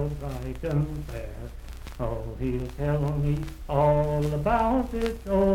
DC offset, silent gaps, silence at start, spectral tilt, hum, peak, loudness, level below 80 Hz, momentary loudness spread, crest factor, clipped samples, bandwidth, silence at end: under 0.1%; none; 0 s; -8 dB/octave; none; -10 dBFS; -27 LUFS; -36 dBFS; 14 LU; 16 dB; under 0.1%; 15.5 kHz; 0 s